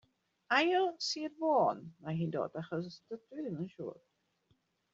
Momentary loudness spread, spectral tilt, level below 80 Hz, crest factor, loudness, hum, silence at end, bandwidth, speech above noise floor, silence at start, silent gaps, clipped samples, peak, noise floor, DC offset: 16 LU; -3.5 dB/octave; -80 dBFS; 22 dB; -34 LUFS; none; 1 s; 7.4 kHz; 41 dB; 0.5 s; none; under 0.1%; -14 dBFS; -76 dBFS; under 0.1%